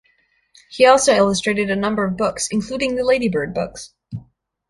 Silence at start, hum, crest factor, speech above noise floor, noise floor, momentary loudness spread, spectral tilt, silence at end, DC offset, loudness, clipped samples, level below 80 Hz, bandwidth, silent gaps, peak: 0.7 s; none; 18 dB; 44 dB; -62 dBFS; 22 LU; -4 dB/octave; 0.5 s; under 0.1%; -18 LUFS; under 0.1%; -50 dBFS; 11.5 kHz; none; -2 dBFS